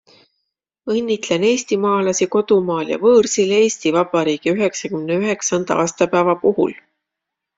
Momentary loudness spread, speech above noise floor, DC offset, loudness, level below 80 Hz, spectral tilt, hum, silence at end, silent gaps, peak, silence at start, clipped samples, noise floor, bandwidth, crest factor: 7 LU; 65 dB; under 0.1%; -17 LUFS; -60 dBFS; -4 dB/octave; none; 0.8 s; none; -2 dBFS; 0.85 s; under 0.1%; -81 dBFS; 7.8 kHz; 16 dB